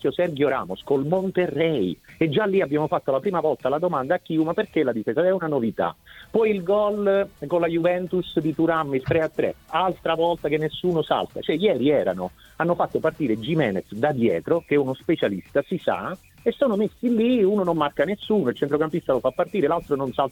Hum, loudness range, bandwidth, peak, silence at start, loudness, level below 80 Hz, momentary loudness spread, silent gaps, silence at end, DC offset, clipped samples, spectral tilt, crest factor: none; 1 LU; 17.5 kHz; -6 dBFS; 0.05 s; -23 LUFS; -56 dBFS; 5 LU; none; 0 s; under 0.1%; under 0.1%; -7.5 dB/octave; 16 dB